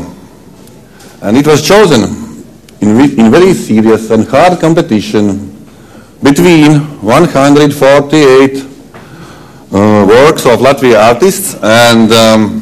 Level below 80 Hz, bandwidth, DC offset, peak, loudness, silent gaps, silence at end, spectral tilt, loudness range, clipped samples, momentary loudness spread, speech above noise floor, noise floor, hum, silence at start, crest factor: -38 dBFS; 15 kHz; under 0.1%; 0 dBFS; -6 LUFS; none; 0 s; -5.5 dB/octave; 2 LU; 7%; 9 LU; 29 dB; -34 dBFS; none; 0 s; 6 dB